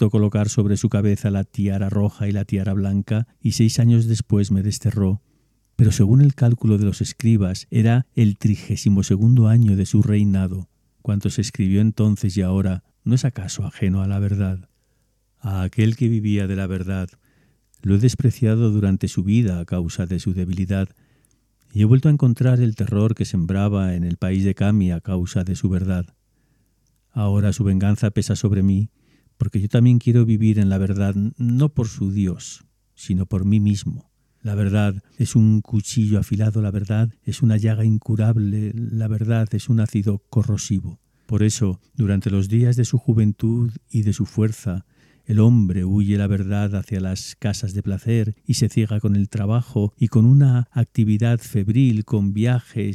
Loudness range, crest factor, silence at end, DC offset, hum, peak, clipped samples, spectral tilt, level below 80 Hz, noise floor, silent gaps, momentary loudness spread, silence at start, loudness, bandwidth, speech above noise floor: 4 LU; 16 dB; 0 s; under 0.1%; none; -2 dBFS; under 0.1%; -7.5 dB/octave; -46 dBFS; -65 dBFS; none; 9 LU; 0 s; -20 LUFS; 12.5 kHz; 47 dB